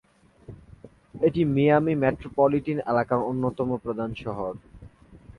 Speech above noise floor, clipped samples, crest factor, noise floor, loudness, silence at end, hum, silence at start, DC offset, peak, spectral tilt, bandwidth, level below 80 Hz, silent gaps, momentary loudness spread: 26 dB; under 0.1%; 18 dB; -50 dBFS; -25 LUFS; 0.1 s; none; 0.5 s; under 0.1%; -8 dBFS; -9.5 dB/octave; 10.5 kHz; -52 dBFS; none; 11 LU